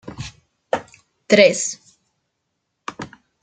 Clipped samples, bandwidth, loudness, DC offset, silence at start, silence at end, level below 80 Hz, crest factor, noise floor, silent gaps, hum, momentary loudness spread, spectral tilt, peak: under 0.1%; 9.6 kHz; -17 LUFS; under 0.1%; 0.05 s; 0.35 s; -56 dBFS; 20 dB; -75 dBFS; none; none; 23 LU; -3 dB/octave; -2 dBFS